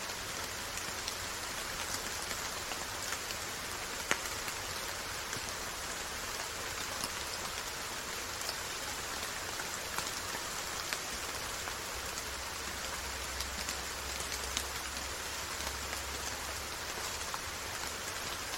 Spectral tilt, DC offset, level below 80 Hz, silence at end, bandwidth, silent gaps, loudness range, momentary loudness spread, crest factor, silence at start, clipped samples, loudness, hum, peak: -1 dB/octave; under 0.1%; -54 dBFS; 0 s; 16.5 kHz; none; 1 LU; 2 LU; 30 dB; 0 s; under 0.1%; -37 LUFS; none; -8 dBFS